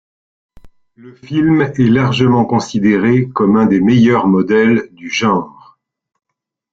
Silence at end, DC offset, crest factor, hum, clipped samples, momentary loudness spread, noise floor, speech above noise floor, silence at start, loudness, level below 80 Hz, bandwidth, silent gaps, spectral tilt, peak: 1.25 s; under 0.1%; 14 dB; none; under 0.1%; 7 LU; -78 dBFS; 66 dB; 0.65 s; -13 LUFS; -50 dBFS; 7.8 kHz; none; -7 dB/octave; 0 dBFS